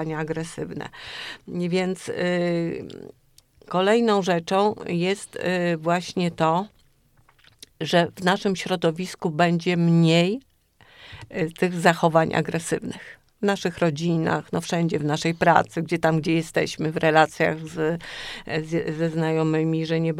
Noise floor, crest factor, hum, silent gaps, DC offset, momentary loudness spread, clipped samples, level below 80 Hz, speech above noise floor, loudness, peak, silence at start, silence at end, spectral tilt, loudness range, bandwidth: -59 dBFS; 22 dB; none; none; under 0.1%; 14 LU; under 0.1%; -58 dBFS; 36 dB; -23 LUFS; -2 dBFS; 0 s; 0 s; -6 dB/octave; 3 LU; 13 kHz